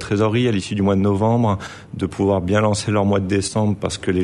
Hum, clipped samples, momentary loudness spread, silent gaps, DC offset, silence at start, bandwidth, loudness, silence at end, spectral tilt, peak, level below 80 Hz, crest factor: none; under 0.1%; 6 LU; none; under 0.1%; 0 s; 11.5 kHz; -19 LUFS; 0 s; -6 dB/octave; -6 dBFS; -46 dBFS; 14 dB